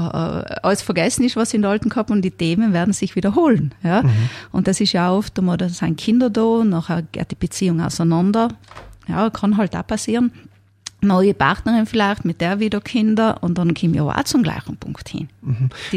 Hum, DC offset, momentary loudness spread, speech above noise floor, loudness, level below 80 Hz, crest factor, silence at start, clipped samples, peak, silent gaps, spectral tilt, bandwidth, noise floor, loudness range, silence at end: none; under 0.1%; 8 LU; 22 dB; -18 LUFS; -44 dBFS; 16 dB; 0 s; under 0.1%; -2 dBFS; none; -6 dB/octave; 14.5 kHz; -40 dBFS; 2 LU; 0 s